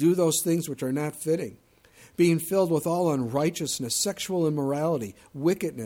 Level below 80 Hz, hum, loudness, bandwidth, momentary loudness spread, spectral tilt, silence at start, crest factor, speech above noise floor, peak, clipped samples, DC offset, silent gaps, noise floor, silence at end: -64 dBFS; none; -26 LUFS; 17.5 kHz; 7 LU; -5 dB/octave; 0 s; 16 dB; 30 dB; -10 dBFS; under 0.1%; under 0.1%; none; -55 dBFS; 0 s